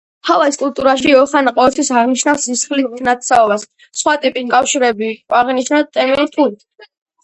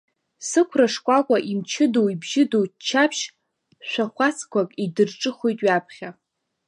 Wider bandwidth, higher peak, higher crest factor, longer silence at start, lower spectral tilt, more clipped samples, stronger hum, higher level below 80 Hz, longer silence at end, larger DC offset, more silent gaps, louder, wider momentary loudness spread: about the same, 11 kHz vs 11.5 kHz; first, 0 dBFS vs -4 dBFS; about the same, 14 dB vs 18 dB; second, 0.25 s vs 0.4 s; second, -2 dB/octave vs -4 dB/octave; neither; neither; first, -54 dBFS vs -76 dBFS; first, 0.7 s vs 0.55 s; neither; neither; first, -14 LUFS vs -22 LUFS; second, 6 LU vs 11 LU